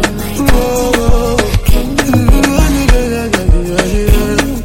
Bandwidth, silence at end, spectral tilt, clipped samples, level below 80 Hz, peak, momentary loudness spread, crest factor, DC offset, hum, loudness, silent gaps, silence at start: 17 kHz; 0 s; -5 dB/octave; 1%; -14 dBFS; 0 dBFS; 3 LU; 10 dB; under 0.1%; none; -12 LUFS; none; 0 s